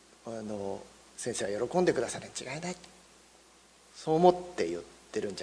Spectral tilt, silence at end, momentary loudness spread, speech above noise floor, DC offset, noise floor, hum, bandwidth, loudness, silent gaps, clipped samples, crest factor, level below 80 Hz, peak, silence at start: -5 dB/octave; 0 s; 18 LU; 29 dB; under 0.1%; -60 dBFS; none; 11 kHz; -32 LUFS; none; under 0.1%; 24 dB; -66 dBFS; -8 dBFS; 0.25 s